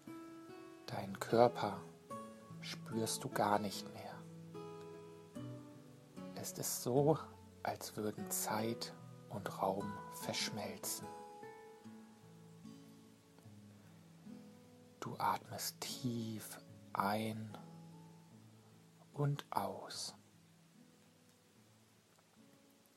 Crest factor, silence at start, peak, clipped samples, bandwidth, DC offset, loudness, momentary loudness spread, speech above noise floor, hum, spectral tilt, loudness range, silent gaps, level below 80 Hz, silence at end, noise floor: 28 dB; 0 s; -16 dBFS; under 0.1%; 16 kHz; under 0.1%; -41 LUFS; 24 LU; 30 dB; none; -4.5 dB/octave; 11 LU; none; -80 dBFS; 0.45 s; -69 dBFS